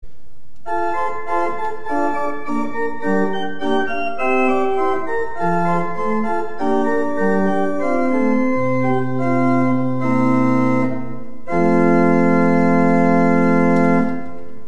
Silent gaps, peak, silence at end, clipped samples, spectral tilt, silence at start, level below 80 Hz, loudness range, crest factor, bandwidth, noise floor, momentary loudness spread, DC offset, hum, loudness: none; -2 dBFS; 0.05 s; under 0.1%; -8 dB/octave; 0 s; -50 dBFS; 6 LU; 16 dB; 9.2 kHz; -52 dBFS; 9 LU; 8%; none; -18 LUFS